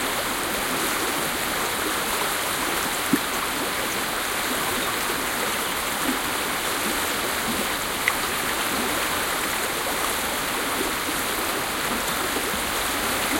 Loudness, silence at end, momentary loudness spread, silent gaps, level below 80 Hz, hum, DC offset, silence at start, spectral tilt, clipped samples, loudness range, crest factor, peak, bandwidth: -24 LUFS; 0 s; 1 LU; none; -48 dBFS; none; under 0.1%; 0 s; -1.5 dB/octave; under 0.1%; 1 LU; 22 dB; -4 dBFS; 17 kHz